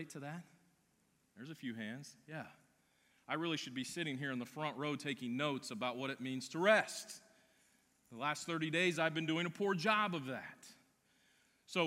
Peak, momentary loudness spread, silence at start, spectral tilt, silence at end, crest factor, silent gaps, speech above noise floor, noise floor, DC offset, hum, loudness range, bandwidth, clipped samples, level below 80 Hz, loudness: -16 dBFS; 18 LU; 0 s; -4.5 dB/octave; 0 s; 24 dB; none; 37 dB; -77 dBFS; under 0.1%; none; 8 LU; 16 kHz; under 0.1%; -88 dBFS; -38 LUFS